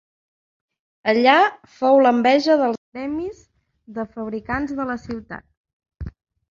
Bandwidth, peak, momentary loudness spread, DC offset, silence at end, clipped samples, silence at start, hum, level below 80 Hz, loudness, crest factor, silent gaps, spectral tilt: 7.6 kHz; -2 dBFS; 22 LU; under 0.1%; 0.4 s; under 0.1%; 1.05 s; none; -48 dBFS; -19 LUFS; 20 dB; 2.78-2.92 s, 5.57-5.64 s, 5.73-5.80 s; -5.5 dB/octave